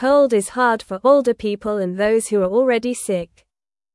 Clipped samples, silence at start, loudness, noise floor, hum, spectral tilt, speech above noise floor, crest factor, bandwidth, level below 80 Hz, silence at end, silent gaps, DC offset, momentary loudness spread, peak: under 0.1%; 0 s; -18 LUFS; -83 dBFS; none; -5 dB/octave; 66 dB; 16 dB; 12 kHz; -54 dBFS; 0.7 s; none; under 0.1%; 8 LU; -2 dBFS